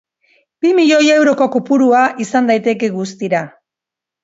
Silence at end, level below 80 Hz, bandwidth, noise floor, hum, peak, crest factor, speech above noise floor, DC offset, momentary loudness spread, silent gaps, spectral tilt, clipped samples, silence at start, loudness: 0.75 s; -66 dBFS; 8 kHz; -85 dBFS; none; 0 dBFS; 14 dB; 72 dB; under 0.1%; 10 LU; none; -4.5 dB/octave; under 0.1%; 0.65 s; -13 LUFS